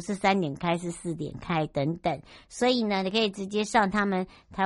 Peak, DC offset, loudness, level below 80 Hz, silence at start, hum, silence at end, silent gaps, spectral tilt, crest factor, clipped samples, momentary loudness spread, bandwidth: -8 dBFS; under 0.1%; -28 LUFS; -56 dBFS; 0 s; none; 0 s; none; -5 dB/octave; 20 dB; under 0.1%; 10 LU; 11.5 kHz